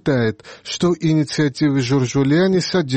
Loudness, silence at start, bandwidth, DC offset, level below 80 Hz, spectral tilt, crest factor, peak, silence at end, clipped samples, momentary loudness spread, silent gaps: -18 LUFS; 0.05 s; 8.8 kHz; 0.1%; -52 dBFS; -6 dB/octave; 10 dB; -6 dBFS; 0 s; under 0.1%; 6 LU; none